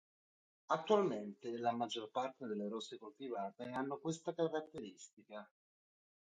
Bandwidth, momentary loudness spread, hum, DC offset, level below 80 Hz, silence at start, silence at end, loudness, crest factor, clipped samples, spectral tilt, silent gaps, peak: 9 kHz; 18 LU; none; under 0.1%; -86 dBFS; 0.7 s; 0.85 s; -41 LUFS; 22 dB; under 0.1%; -5 dB/octave; 5.13-5.17 s; -20 dBFS